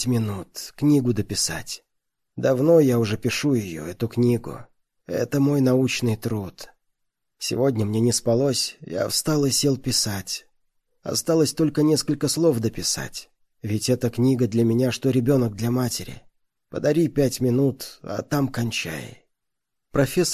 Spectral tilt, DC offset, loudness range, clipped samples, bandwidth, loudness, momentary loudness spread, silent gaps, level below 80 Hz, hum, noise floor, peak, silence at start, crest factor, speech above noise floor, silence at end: -5 dB/octave; under 0.1%; 2 LU; under 0.1%; 14.5 kHz; -22 LUFS; 13 LU; none; -52 dBFS; none; -83 dBFS; -6 dBFS; 0 s; 16 dB; 61 dB; 0 s